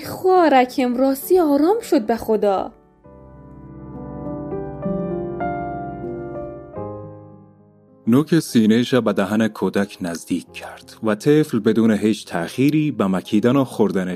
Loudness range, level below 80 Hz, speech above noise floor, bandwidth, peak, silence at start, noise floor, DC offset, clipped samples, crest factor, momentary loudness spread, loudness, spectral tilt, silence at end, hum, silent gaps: 10 LU; -50 dBFS; 33 dB; 15.5 kHz; -4 dBFS; 0 s; -50 dBFS; under 0.1%; under 0.1%; 16 dB; 16 LU; -19 LUFS; -6.5 dB/octave; 0 s; none; none